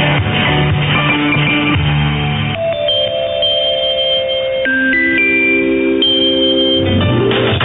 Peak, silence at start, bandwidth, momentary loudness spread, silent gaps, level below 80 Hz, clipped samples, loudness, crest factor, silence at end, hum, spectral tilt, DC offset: -2 dBFS; 0 s; 4.2 kHz; 5 LU; none; -34 dBFS; under 0.1%; -12 LUFS; 12 dB; 0 s; none; -9 dB/octave; under 0.1%